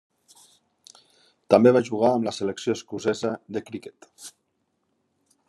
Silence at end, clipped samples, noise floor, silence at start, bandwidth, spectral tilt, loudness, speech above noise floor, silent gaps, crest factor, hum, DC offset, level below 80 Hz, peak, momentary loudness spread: 1.2 s; under 0.1%; -74 dBFS; 1.5 s; 12.5 kHz; -6 dB/octave; -23 LUFS; 51 dB; none; 24 dB; none; under 0.1%; -72 dBFS; -2 dBFS; 26 LU